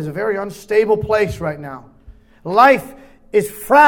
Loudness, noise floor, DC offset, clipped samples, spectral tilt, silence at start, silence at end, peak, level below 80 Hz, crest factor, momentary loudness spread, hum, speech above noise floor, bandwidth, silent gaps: -17 LUFS; -44 dBFS; under 0.1%; under 0.1%; -5.5 dB/octave; 0 s; 0 s; 0 dBFS; -46 dBFS; 16 dB; 21 LU; none; 29 dB; 18 kHz; none